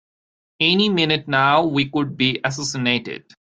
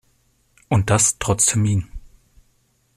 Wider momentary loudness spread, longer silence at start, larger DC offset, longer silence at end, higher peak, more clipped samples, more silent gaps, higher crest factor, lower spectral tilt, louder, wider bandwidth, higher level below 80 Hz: about the same, 7 LU vs 8 LU; about the same, 0.6 s vs 0.7 s; neither; second, 0.25 s vs 0.95 s; about the same, -2 dBFS vs -4 dBFS; neither; neither; about the same, 18 dB vs 18 dB; about the same, -4.5 dB/octave vs -4 dB/octave; about the same, -19 LUFS vs -18 LUFS; second, 9.4 kHz vs 14.5 kHz; second, -60 dBFS vs -42 dBFS